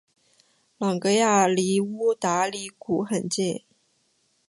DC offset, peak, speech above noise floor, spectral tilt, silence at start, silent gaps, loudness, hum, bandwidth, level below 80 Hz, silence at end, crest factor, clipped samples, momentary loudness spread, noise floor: under 0.1%; -6 dBFS; 45 dB; -4.5 dB/octave; 0.8 s; none; -24 LUFS; none; 11.5 kHz; -70 dBFS; 0.9 s; 20 dB; under 0.1%; 10 LU; -68 dBFS